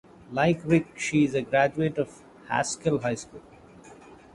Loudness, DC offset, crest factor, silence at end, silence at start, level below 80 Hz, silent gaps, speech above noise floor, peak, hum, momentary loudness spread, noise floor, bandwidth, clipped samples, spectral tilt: -26 LUFS; under 0.1%; 20 dB; 0.2 s; 0.3 s; -58 dBFS; none; 24 dB; -8 dBFS; none; 11 LU; -49 dBFS; 11.5 kHz; under 0.1%; -5.5 dB/octave